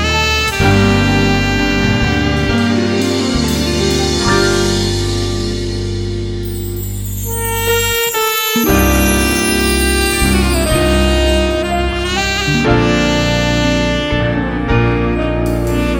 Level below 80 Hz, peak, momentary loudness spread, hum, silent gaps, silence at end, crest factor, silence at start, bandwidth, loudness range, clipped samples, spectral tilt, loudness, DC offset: -22 dBFS; 0 dBFS; 7 LU; none; none; 0 s; 14 dB; 0 s; 17 kHz; 4 LU; under 0.1%; -4.5 dB/octave; -14 LUFS; under 0.1%